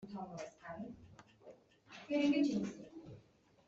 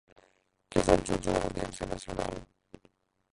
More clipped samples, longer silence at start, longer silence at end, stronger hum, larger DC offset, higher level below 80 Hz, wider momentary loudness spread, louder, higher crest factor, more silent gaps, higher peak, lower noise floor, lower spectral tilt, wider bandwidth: neither; second, 0 s vs 0.7 s; second, 0.5 s vs 0.9 s; neither; neither; second, -74 dBFS vs -46 dBFS; first, 27 LU vs 12 LU; second, -38 LUFS vs -31 LUFS; second, 18 dB vs 26 dB; neither; second, -22 dBFS vs -6 dBFS; about the same, -67 dBFS vs -69 dBFS; about the same, -6 dB/octave vs -5 dB/octave; second, 7.6 kHz vs 11.5 kHz